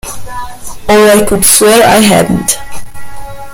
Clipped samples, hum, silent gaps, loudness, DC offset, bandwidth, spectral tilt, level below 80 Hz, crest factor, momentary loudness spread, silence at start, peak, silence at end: 1%; none; none; -6 LUFS; under 0.1%; over 20 kHz; -3 dB/octave; -30 dBFS; 8 dB; 23 LU; 0.05 s; 0 dBFS; 0 s